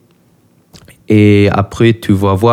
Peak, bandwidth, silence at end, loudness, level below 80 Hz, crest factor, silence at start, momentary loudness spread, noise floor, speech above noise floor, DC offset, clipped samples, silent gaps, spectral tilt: 0 dBFS; 15 kHz; 0 s; -10 LUFS; -42 dBFS; 12 dB; 1.1 s; 5 LU; -51 dBFS; 41 dB; under 0.1%; under 0.1%; none; -7.5 dB/octave